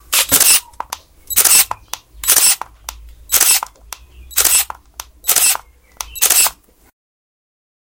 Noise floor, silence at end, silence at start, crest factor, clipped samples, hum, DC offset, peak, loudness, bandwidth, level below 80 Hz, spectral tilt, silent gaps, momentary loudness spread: -37 dBFS; 1.4 s; 0.1 s; 16 dB; under 0.1%; none; under 0.1%; 0 dBFS; -11 LUFS; over 20 kHz; -44 dBFS; 1.5 dB/octave; none; 21 LU